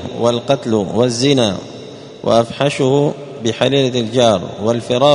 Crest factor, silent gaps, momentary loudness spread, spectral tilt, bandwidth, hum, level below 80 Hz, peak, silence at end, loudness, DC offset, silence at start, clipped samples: 16 dB; none; 9 LU; -5.5 dB/octave; 11 kHz; none; -52 dBFS; 0 dBFS; 0 s; -15 LUFS; under 0.1%; 0 s; under 0.1%